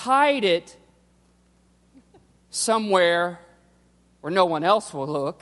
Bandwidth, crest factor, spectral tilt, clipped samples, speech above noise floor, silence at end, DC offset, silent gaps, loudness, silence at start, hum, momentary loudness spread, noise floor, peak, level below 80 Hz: 11.5 kHz; 20 dB; -3.5 dB/octave; under 0.1%; 39 dB; 0.1 s; under 0.1%; none; -22 LUFS; 0 s; none; 11 LU; -60 dBFS; -4 dBFS; -66 dBFS